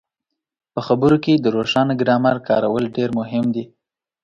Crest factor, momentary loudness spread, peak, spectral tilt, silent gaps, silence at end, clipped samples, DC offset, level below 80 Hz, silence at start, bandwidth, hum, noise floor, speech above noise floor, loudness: 16 dB; 7 LU; -2 dBFS; -7.5 dB/octave; none; 0.6 s; under 0.1%; under 0.1%; -54 dBFS; 0.75 s; 7.8 kHz; none; -81 dBFS; 64 dB; -18 LUFS